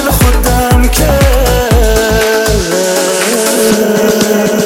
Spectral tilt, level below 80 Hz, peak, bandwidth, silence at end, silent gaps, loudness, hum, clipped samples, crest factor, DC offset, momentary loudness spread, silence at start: -4.5 dB/octave; -14 dBFS; 0 dBFS; 17 kHz; 0 s; none; -9 LUFS; none; under 0.1%; 8 dB; under 0.1%; 2 LU; 0 s